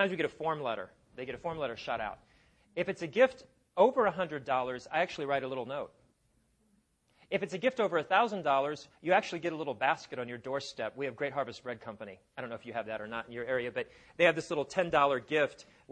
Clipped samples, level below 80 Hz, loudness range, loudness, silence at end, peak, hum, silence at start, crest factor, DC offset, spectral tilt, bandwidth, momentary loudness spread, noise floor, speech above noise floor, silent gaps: under 0.1%; -68 dBFS; 7 LU; -33 LUFS; 0 s; -10 dBFS; none; 0 s; 22 dB; under 0.1%; -5 dB/octave; 9.8 kHz; 14 LU; -72 dBFS; 40 dB; none